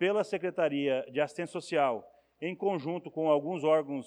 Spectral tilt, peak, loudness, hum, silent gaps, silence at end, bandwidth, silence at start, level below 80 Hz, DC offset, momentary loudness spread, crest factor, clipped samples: -6 dB/octave; -14 dBFS; -31 LUFS; none; none; 0 s; 11 kHz; 0 s; -82 dBFS; under 0.1%; 9 LU; 16 dB; under 0.1%